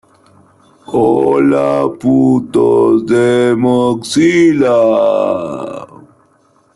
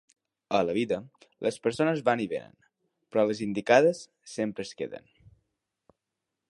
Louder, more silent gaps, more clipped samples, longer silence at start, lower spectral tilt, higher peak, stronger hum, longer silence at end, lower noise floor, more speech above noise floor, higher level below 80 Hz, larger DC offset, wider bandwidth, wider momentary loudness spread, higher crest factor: first, -11 LUFS vs -28 LUFS; neither; neither; first, 0.9 s vs 0.5 s; about the same, -6.5 dB/octave vs -5.5 dB/octave; first, -2 dBFS vs -6 dBFS; neither; second, 0.9 s vs 1.5 s; second, -52 dBFS vs -86 dBFS; second, 42 dB vs 59 dB; first, -50 dBFS vs -68 dBFS; neither; about the same, 12 kHz vs 11.5 kHz; second, 9 LU vs 16 LU; second, 10 dB vs 24 dB